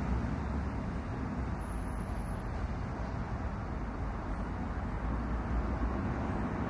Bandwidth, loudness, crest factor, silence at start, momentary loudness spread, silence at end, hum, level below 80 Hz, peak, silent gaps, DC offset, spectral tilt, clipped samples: 11.5 kHz; -37 LUFS; 14 dB; 0 s; 4 LU; 0 s; none; -38 dBFS; -22 dBFS; none; under 0.1%; -8 dB/octave; under 0.1%